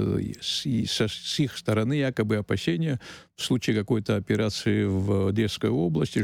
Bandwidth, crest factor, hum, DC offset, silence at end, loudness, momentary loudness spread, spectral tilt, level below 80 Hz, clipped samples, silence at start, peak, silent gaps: 16 kHz; 14 dB; none; under 0.1%; 0 s; -26 LUFS; 3 LU; -5.5 dB/octave; -54 dBFS; under 0.1%; 0 s; -12 dBFS; none